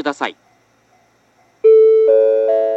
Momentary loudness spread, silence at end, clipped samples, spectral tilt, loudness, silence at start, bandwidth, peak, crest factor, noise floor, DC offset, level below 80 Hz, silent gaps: 14 LU; 0 s; under 0.1%; -4 dB/octave; -12 LUFS; 0 s; 7.8 kHz; -2 dBFS; 12 dB; -56 dBFS; under 0.1%; -76 dBFS; none